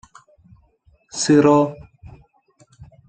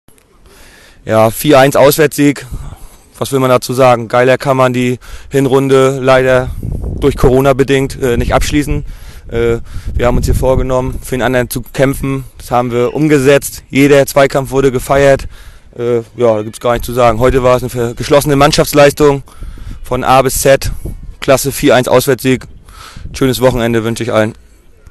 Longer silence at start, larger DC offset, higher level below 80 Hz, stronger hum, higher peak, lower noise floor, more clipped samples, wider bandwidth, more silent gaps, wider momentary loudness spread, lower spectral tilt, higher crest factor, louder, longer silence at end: about the same, 1.15 s vs 1.05 s; neither; second, -54 dBFS vs -26 dBFS; neither; about the same, -2 dBFS vs 0 dBFS; first, -58 dBFS vs -42 dBFS; second, under 0.1% vs 0.2%; second, 9 kHz vs 13 kHz; neither; first, 20 LU vs 13 LU; about the same, -5.5 dB/octave vs -5.5 dB/octave; first, 18 dB vs 12 dB; second, -16 LUFS vs -11 LUFS; second, 0.25 s vs 0.6 s